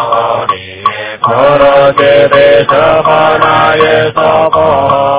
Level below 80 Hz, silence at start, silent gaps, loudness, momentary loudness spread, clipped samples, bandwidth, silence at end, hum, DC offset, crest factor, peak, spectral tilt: -38 dBFS; 0 s; none; -7 LUFS; 9 LU; 4%; 4 kHz; 0 s; none; under 0.1%; 8 dB; 0 dBFS; -9 dB/octave